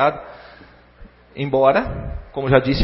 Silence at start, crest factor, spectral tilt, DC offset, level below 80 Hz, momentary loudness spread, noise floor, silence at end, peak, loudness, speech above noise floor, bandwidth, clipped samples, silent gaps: 0 s; 20 dB; -9.5 dB/octave; under 0.1%; -36 dBFS; 23 LU; -46 dBFS; 0 s; 0 dBFS; -19 LUFS; 28 dB; 5.8 kHz; under 0.1%; none